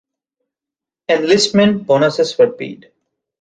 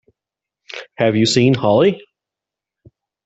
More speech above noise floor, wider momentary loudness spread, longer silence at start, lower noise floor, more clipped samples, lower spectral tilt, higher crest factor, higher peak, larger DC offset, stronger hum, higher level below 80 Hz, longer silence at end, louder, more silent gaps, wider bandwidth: about the same, 73 dB vs 72 dB; second, 16 LU vs 19 LU; first, 1.1 s vs 0.75 s; about the same, -87 dBFS vs -86 dBFS; neither; about the same, -4.5 dB/octave vs -5.5 dB/octave; about the same, 16 dB vs 16 dB; about the same, -2 dBFS vs -2 dBFS; neither; neither; about the same, -56 dBFS vs -56 dBFS; second, 0.65 s vs 1.25 s; about the same, -14 LUFS vs -15 LUFS; neither; first, 9.4 kHz vs 8.2 kHz